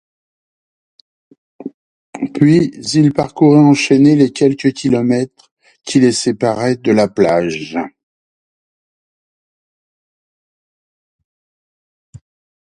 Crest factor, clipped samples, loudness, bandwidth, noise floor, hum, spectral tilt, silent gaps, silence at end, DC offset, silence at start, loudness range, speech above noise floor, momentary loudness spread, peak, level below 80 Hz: 16 dB; under 0.1%; -13 LUFS; 11 kHz; under -90 dBFS; none; -6 dB/octave; 1.74-2.13 s, 5.51-5.57 s; 4.9 s; under 0.1%; 1.6 s; 8 LU; over 78 dB; 16 LU; 0 dBFS; -54 dBFS